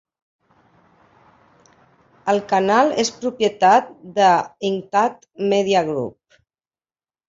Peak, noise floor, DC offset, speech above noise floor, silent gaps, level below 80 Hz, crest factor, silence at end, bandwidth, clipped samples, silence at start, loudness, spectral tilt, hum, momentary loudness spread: -2 dBFS; under -90 dBFS; under 0.1%; over 72 dB; none; -64 dBFS; 18 dB; 1.2 s; 7.8 kHz; under 0.1%; 2.25 s; -19 LUFS; -4 dB/octave; none; 10 LU